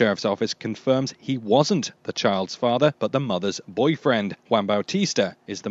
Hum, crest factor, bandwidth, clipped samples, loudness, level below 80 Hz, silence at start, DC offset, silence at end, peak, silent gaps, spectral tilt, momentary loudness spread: none; 18 dB; 8 kHz; under 0.1%; -23 LUFS; -70 dBFS; 0 s; under 0.1%; 0 s; -4 dBFS; none; -5 dB/octave; 7 LU